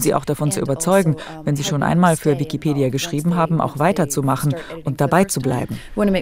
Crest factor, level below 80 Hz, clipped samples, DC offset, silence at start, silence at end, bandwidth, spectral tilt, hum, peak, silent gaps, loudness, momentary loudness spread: 18 dB; -44 dBFS; under 0.1%; under 0.1%; 0 s; 0 s; 16 kHz; -5.5 dB/octave; none; -2 dBFS; none; -19 LUFS; 7 LU